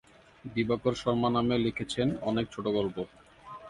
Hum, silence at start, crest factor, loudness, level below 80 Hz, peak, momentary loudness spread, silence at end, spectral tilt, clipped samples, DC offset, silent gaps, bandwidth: none; 0.45 s; 18 dB; -30 LUFS; -56 dBFS; -14 dBFS; 13 LU; 0 s; -6.5 dB/octave; under 0.1%; under 0.1%; none; 11.5 kHz